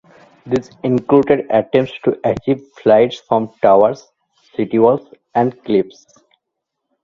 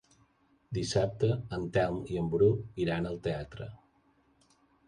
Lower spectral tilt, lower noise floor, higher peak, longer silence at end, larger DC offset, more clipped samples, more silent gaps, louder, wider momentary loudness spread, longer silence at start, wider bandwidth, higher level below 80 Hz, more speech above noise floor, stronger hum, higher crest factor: about the same, -7.5 dB/octave vs -6.5 dB/octave; first, -77 dBFS vs -68 dBFS; first, 0 dBFS vs -14 dBFS; about the same, 1.15 s vs 1.1 s; neither; neither; neither; first, -16 LUFS vs -31 LUFS; second, 9 LU vs 12 LU; second, 0.45 s vs 0.7 s; second, 7.4 kHz vs 11 kHz; about the same, -52 dBFS vs -54 dBFS; first, 62 dB vs 38 dB; neither; about the same, 16 dB vs 18 dB